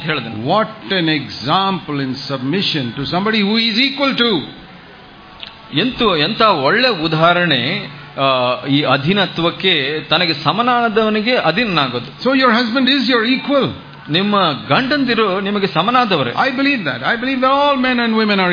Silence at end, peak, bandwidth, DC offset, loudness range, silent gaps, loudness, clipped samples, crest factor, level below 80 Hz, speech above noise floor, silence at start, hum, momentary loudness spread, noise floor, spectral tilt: 0 s; 0 dBFS; 5.2 kHz; under 0.1%; 2 LU; none; -15 LUFS; under 0.1%; 16 dB; -50 dBFS; 24 dB; 0 s; none; 7 LU; -39 dBFS; -6.5 dB/octave